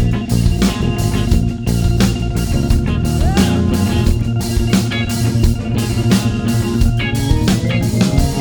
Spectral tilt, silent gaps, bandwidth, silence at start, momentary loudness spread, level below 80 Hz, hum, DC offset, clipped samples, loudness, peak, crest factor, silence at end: -6 dB/octave; none; over 20 kHz; 0 s; 3 LU; -20 dBFS; none; under 0.1%; under 0.1%; -16 LUFS; 0 dBFS; 14 dB; 0 s